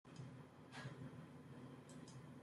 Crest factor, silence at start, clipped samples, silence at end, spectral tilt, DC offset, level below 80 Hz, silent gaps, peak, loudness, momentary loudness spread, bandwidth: 16 dB; 0.05 s; under 0.1%; 0 s; -6 dB/octave; under 0.1%; -84 dBFS; none; -40 dBFS; -57 LUFS; 4 LU; 13.5 kHz